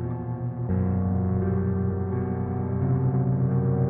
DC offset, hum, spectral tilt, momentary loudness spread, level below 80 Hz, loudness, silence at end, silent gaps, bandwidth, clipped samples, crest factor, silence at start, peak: under 0.1%; none; -13.5 dB/octave; 6 LU; -48 dBFS; -26 LUFS; 0 s; none; 2.4 kHz; under 0.1%; 12 dB; 0 s; -12 dBFS